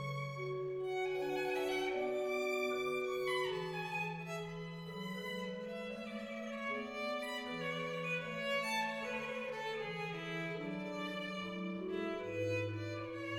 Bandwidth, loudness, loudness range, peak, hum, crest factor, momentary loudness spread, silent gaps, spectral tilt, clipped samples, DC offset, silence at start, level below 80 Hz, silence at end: 17 kHz; -40 LUFS; 5 LU; -26 dBFS; none; 14 dB; 7 LU; none; -5 dB/octave; under 0.1%; under 0.1%; 0 s; -72 dBFS; 0 s